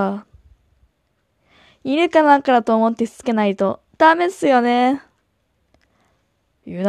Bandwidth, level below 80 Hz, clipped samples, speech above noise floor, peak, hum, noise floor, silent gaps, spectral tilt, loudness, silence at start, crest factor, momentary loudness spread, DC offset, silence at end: 12.5 kHz; -60 dBFS; under 0.1%; 51 dB; 0 dBFS; none; -67 dBFS; none; -5.5 dB/octave; -17 LUFS; 0 s; 20 dB; 11 LU; under 0.1%; 0 s